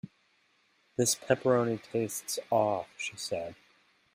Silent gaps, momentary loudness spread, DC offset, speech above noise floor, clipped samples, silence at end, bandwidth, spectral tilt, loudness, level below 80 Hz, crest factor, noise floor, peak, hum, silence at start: none; 11 LU; under 0.1%; 39 dB; under 0.1%; 0.6 s; 16 kHz; -4 dB/octave; -31 LUFS; -72 dBFS; 22 dB; -70 dBFS; -10 dBFS; none; 0.05 s